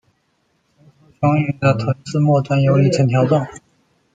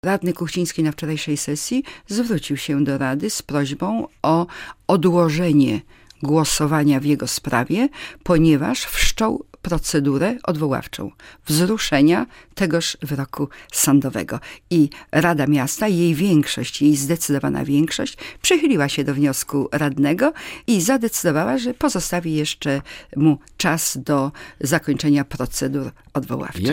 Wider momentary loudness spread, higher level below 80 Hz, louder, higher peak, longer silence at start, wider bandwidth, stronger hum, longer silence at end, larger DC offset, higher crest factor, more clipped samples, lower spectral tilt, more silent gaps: second, 6 LU vs 10 LU; second, -52 dBFS vs -40 dBFS; first, -17 LUFS vs -20 LUFS; about the same, -2 dBFS vs -2 dBFS; first, 1.2 s vs 0.05 s; second, 8.8 kHz vs 17 kHz; neither; first, 0.55 s vs 0 s; neither; about the same, 16 dB vs 18 dB; neither; first, -7.5 dB/octave vs -5 dB/octave; neither